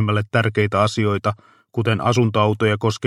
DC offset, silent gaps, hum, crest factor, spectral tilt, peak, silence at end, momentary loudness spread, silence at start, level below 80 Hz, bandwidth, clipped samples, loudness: under 0.1%; none; none; 16 dB; -6.5 dB/octave; -2 dBFS; 0 s; 7 LU; 0 s; -56 dBFS; 11.5 kHz; under 0.1%; -19 LUFS